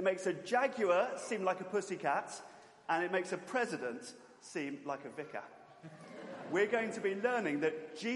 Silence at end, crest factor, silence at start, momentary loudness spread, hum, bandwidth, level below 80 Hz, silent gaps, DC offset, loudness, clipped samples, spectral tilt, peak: 0 s; 18 dB; 0 s; 18 LU; none; 11.5 kHz; -88 dBFS; none; under 0.1%; -36 LUFS; under 0.1%; -4.5 dB/octave; -18 dBFS